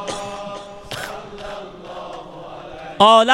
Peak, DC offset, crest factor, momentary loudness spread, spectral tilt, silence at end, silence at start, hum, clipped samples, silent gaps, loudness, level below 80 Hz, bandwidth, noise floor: 0 dBFS; under 0.1%; 20 dB; 21 LU; -3.5 dB/octave; 0 s; 0 s; none; under 0.1%; none; -18 LUFS; -50 dBFS; 16.5 kHz; -35 dBFS